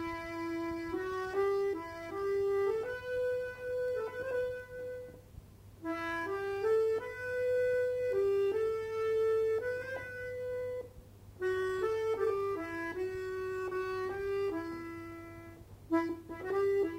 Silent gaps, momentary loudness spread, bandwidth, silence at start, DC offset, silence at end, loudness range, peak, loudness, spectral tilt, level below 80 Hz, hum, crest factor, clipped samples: none; 13 LU; 16 kHz; 0 s; under 0.1%; 0 s; 5 LU; -20 dBFS; -35 LUFS; -6 dB/octave; -62 dBFS; none; 14 dB; under 0.1%